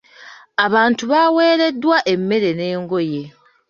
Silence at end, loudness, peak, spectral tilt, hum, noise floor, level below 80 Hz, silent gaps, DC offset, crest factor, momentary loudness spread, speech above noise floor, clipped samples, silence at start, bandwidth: 0.4 s; -16 LUFS; -2 dBFS; -5.5 dB/octave; none; -42 dBFS; -64 dBFS; none; under 0.1%; 16 dB; 9 LU; 26 dB; under 0.1%; 0.2 s; 7.4 kHz